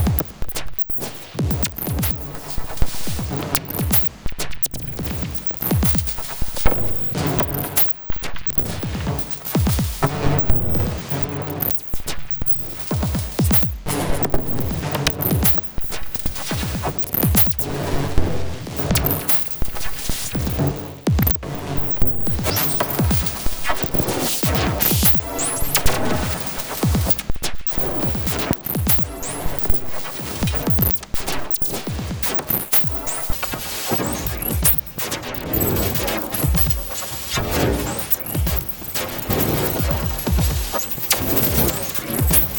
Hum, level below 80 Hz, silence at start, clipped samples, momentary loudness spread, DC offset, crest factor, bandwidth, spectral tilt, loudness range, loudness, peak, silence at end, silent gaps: none; -30 dBFS; 0 s; under 0.1%; 10 LU; under 0.1%; 20 dB; over 20 kHz; -4.5 dB/octave; 3 LU; -18 LUFS; 0 dBFS; 0 s; none